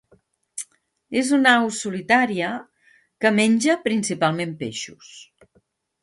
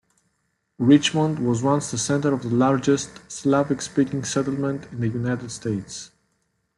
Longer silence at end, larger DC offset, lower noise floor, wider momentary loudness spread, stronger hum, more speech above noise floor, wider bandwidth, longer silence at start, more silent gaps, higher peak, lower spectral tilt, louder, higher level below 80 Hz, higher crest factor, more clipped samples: about the same, 0.8 s vs 0.7 s; neither; second, -64 dBFS vs -73 dBFS; first, 18 LU vs 11 LU; neither; second, 44 dB vs 51 dB; about the same, 11.5 kHz vs 11.5 kHz; second, 0.55 s vs 0.8 s; neither; about the same, -2 dBFS vs -4 dBFS; second, -4 dB/octave vs -5.5 dB/octave; about the same, -20 LUFS vs -22 LUFS; second, -68 dBFS vs -58 dBFS; about the same, 20 dB vs 20 dB; neither